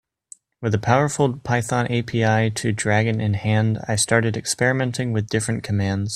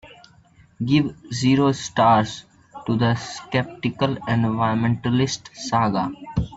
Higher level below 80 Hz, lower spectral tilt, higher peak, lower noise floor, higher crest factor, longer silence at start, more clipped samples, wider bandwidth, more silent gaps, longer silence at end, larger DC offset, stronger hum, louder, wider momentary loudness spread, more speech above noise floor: about the same, -52 dBFS vs -48 dBFS; about the same, -5 dB/octave vs -6 dB/octave; first, 0 dBFS vs -4 dBFS; second, -49 dBFS vs -53 dBFS; about the same, 20 dB vs 18 dB; first, 0.6 s vs 0.05 s; neither; first, 13 kHz vs 8 kHz; neither; about the same, 0 s vs 0 s; neither; neither; about the same, -21 LUFS vs -22 LUFS; second, 5 LU vs 10 LU; about the same, 29 dB vs 32 dB